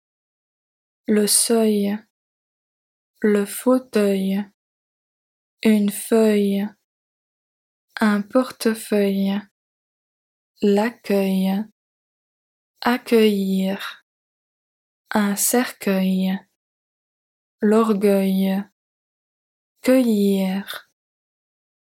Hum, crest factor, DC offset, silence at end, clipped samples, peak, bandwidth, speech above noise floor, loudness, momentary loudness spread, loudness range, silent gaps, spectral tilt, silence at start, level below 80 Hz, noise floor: none; 20 dB; under 0.1%; 1.15 s; under 0.1%; -2 dBFS; 17 kHz; over 71 dB; -20 LUFS; 11 LU; 3 LU; 2.10-3.14 s, 4.54-5.57 s, 6.84-7.88 s, 9.51-10.54 s, 11.72-12.74 s, 14.02-15.05 s, 16.56-17.58 s, 18.72-19.76 s; -5 dB/octave; 1.1 s; -70 dBFS; under -90 dBFS